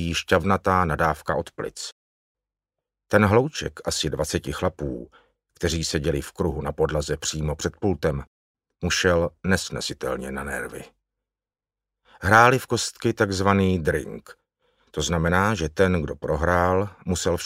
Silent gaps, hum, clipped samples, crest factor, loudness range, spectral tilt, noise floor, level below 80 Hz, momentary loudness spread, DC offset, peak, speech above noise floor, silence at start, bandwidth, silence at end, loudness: 1.92-2.35 s, 8.27-8.55 s; none; under 0.1%; 24 dB; 5 LU; -4.5 dB/octave; under -90 dBFS; -42 dBFS; 12 LU; under 0.1%; 0 dBFS; over 67 dB; 0 s; 16 kHz; 0 s; -23 LUFS